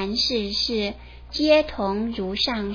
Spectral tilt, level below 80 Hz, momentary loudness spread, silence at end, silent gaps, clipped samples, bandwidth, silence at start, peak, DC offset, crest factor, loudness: -4.5 dB/octave; -42 dBFS; 10 LU; 0 s; none; under 0.1%; 5.4 kHz; 0 s; -6 dBFS; under 0.1%; 18 dB; -23 LUFS